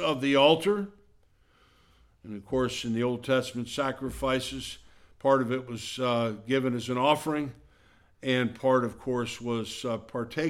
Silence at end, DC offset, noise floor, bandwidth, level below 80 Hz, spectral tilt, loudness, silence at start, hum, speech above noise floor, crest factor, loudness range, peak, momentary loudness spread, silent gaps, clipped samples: 0 s; under 0.1%; -63 dBFS; 16 kHz; -56 dBFS; -5 dB/octave; -28 LUFS; 0 s; none; 35 dB; 22 dB; 3 LU; -8 dBFS; 11 LU; none; under 0.1%